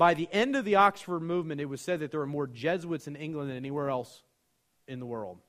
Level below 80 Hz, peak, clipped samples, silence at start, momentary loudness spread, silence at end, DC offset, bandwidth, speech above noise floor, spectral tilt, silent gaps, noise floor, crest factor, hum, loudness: -70 dBFS; -8 dBFS; under 0.1%; 0 s; 14 LU; 0.1 s; under 0.1%; 15.5 kHz; 45 dB; -6 dB/octave; none; -75 dBFS; 22 dB; none; -30 LUFS